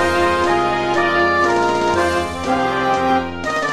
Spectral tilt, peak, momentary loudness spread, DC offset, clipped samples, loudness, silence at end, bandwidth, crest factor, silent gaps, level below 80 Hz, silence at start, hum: -4.5 dB/octave; -2 dBFS; 5 LU; under 0.1%; under 0.1%; -17 LUFS; 0 s; 13.5 kHz; 14 dB; none; -38 dBFS; 0 s; none